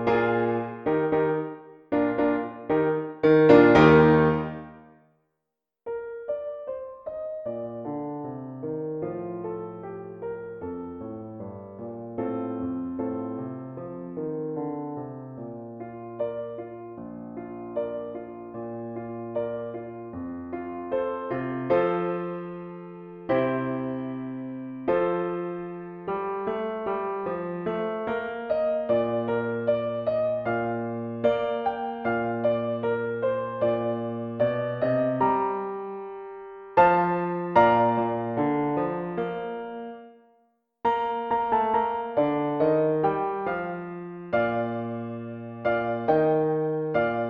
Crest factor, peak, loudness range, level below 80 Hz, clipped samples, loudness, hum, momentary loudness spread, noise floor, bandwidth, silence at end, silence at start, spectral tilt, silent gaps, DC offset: 22 dB; -4 dBFS; 14 LU; -56 dBFS; under 0.1%; -26 LUFS; none; 15 LU; -84 dBFS; 6.6 kHz; 0 s; 0 s; -9 dB/octave; none; under 0.1%